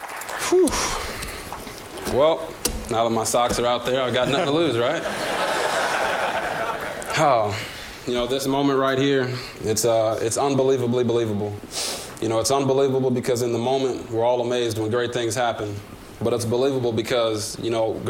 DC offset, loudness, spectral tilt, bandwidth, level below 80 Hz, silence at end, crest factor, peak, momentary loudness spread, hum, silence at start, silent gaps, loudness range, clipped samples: under 0.1%; -22 LUFS; -4 dB/octave; 17 kHz; -46 dBFS; 0 s; 18 dB; -6 dBFS; 9 LU; none; 0 s; none; 2 LU; under 0.1%